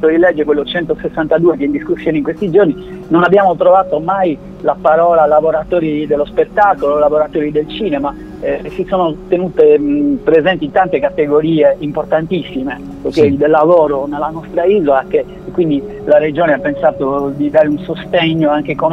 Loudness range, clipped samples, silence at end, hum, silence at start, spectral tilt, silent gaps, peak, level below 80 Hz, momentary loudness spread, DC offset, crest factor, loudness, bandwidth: 2 LU; under 0.1%; 0 s; none; 0 s; -8 dB/octave; none; 0 dBFS; -40 dBFS; 9 LU; under 0.1%; 12 dB; -13 LUFS; 6.8 kHz